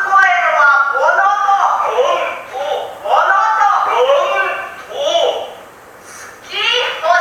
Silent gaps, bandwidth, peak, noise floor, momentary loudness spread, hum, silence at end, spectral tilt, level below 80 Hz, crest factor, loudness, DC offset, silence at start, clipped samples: none; 16.5 kHz; 0 dBFS; -37 dBFS; 13 LU; none; 0 s; -0.5 dB/octave; -60 dBFS; 14 dB; -13 LUFS; under 0.1%; 0 s; under 0.1%